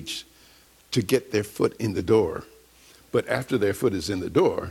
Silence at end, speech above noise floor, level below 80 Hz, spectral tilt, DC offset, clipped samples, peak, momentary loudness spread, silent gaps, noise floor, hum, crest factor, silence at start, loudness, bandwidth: 0 s; 31 dB; -54 dBFS; -5.5 dB/octave; under 0.1%; under 0.1%; -8 dBFS; 7 LU; none; -55 dBFS; none; 18 dB; 0 s; -25 LUFS; 16.5 kHz